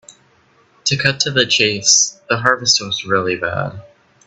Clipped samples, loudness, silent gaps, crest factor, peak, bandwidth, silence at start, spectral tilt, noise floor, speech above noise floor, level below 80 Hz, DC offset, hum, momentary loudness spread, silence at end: under 0.1%; -15 LUFS; none; 18 dB; 0 dBFS; 8.8 kHz; 0.85 s; -1.5 dB/octave; -54 dBFS; 38 dB; -54 dBFS; under 0.1%; none; 10 LU; 0.4 s